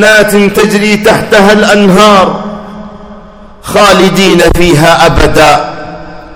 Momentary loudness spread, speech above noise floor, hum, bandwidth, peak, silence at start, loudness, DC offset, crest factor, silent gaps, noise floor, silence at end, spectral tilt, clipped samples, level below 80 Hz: 19 LU; 25 dB; none; over 20 kHz; 0 dBFS; 0 s; -5 LUFS; under 0.1%; 6 dB; none; -30 dBFS; 0 s; -4.5 dB/octave; 10%; -22 dBFS